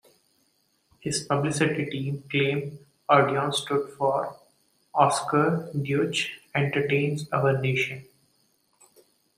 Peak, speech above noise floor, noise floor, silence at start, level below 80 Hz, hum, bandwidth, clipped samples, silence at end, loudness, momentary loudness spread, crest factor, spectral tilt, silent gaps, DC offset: -4 dBFS; 44 dB; -69 dBFS; 1.05 s; -66 dBFS; none; 15 kHz; under 0.1%; 1.35 s; -25 LUFS; 9 LU; 22 dB; -5 dB/octave; none; under 0.1%